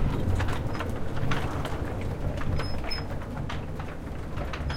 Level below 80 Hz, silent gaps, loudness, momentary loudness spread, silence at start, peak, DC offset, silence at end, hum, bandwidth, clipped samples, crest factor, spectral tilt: -34 dBFS; none; -32 LUFS; 7 LU; 0 s; -14 dBFS; under 0.1%; 0 s; none; 15.5 kHz; under 0.1%; 14 dB; -6.5 dB/octave